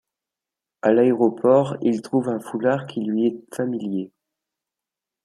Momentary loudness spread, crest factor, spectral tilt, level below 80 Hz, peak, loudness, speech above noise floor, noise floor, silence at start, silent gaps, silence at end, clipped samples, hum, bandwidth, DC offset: 10 LU; 18 dB; -7.5 dB/octave; -70 dBFS; -4 dBFS; -21 LUFS; 67 dB; -88 dBFS; 0.85 s; none; 1.15 s; under 0.1%; none; 13 kHz; under 0.1%